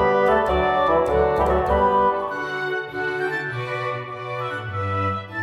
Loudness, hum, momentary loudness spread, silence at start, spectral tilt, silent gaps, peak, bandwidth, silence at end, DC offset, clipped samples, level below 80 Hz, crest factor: -22 LUFS; none; 9 LU; 0 s; -7 dB/octave; none; -6 dBFS; 13 kHz; 0 s; under 0.1%; under 0.1%; -36 dBFS; 14 dB